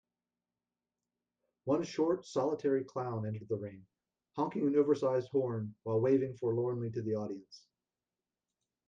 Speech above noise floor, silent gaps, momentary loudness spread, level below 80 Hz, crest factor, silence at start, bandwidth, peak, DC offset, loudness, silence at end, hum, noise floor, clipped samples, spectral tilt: over 57 dB; none; 10 LU; -78 dBFS; 18 dB; 1.65 s; 7.8 kHz; -16 dBFS; under 0.1%; -34 LUFS; 1.3 s; 60 Hz at -65 dBFS; under -90 dBFS; under 0.1%; -8 dB/octave